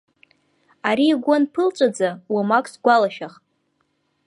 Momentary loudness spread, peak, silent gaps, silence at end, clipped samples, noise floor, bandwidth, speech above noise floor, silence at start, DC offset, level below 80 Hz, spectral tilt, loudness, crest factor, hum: 8 LU; -2 dBFS; none; 0.95 s; under 0.1%; -69 dBFS; 11.5 kHz; 50 dB; 0.85 s; under 0.1%; -76 dBFS; -5 dB/octave; -19 LUFS; 18 dB; none